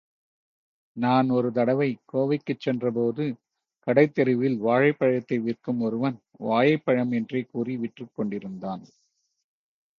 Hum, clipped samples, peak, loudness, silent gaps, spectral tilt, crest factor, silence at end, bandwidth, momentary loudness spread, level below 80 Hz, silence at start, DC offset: none; under 0.1%; -6 dBFS; -25 LUFS; none; -9 dB/octave; 20 dB; 1.15 s; 6.4 kHz; 13 LU; -70 dBFS; 0.95 s; under 0.1%